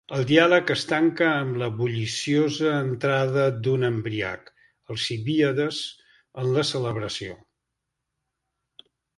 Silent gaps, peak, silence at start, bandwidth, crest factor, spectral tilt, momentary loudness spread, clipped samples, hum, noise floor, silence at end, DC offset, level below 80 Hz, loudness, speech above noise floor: none; -2 dBFS; 0.1 s; 11.5 kHz; 22 dB; -5.5 dB/octave; 12 LU; under 0.1%; none; -82 dBFS; 1.85 s; under 0.1%; -60 dBFS; -24 LUFS; 58 dB